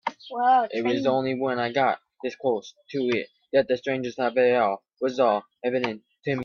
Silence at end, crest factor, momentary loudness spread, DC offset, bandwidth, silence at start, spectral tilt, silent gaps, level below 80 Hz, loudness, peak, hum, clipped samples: 0 s; 16 dB; 10 LU; under 0.1%; 7 kHz; 0.05 s; -6 dB/octave; none; -70 dBFS; -25 LUFS; -8 dBFS; none; under 0.1%